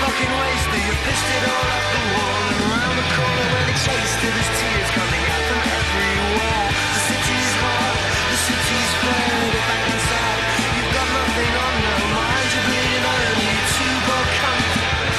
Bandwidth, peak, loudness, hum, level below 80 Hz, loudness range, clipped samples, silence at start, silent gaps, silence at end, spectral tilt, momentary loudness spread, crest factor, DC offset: 13 kHz; -8 dBFS; -18 LUFS; none; -32 dBFS; 1 LU; under 0.1%; 0 s; none; 0 s; -3 dB/octave; 1 LU; 12 dB; under 0.1%